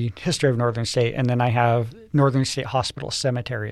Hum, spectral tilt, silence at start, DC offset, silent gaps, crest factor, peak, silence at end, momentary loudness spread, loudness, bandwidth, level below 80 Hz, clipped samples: none; -5.5 dB/octave; 0 s; under 0.1%; none; 18 dB; -4 dBFS; 0 s; 5 LU; -22 LUFS; 12.5 kHz; -52 dBFS; under 0.1%